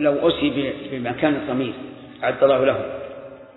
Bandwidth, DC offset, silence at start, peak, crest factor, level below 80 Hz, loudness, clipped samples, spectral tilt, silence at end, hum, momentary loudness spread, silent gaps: 4.1 kHz; under 0.1%; 0 s; -4 dBFS; 18 dB; -52 dBFS; -21 LUFS; under 0.1%; -9.5 dB/octave; 0.05 s; none; 18 LU; none